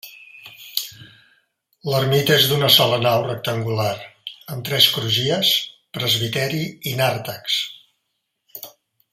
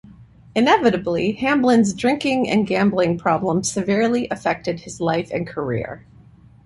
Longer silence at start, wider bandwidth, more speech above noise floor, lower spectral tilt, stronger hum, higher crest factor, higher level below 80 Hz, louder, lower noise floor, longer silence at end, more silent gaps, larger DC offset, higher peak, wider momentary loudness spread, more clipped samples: second, 0.05 s vs 0.2 s; first, 16 kHz vs 11.5 kHz; first, 56 dB vs 28 dB; second, -3.5 dB/octave vs -5 dB/octave; neither; first, 22 dB vs 16 dB; second, -60 dBFS vs -52 dBFS; about the same, -18 LUFS vs -20 LUFS; first, -75 dBFS vs -47 dBFS; second, 0.45 s vs 0.65 s; neither; neither; about the same, 0 dBFS vs -2 dBFS; first, 22 LU vs 10 LU; neither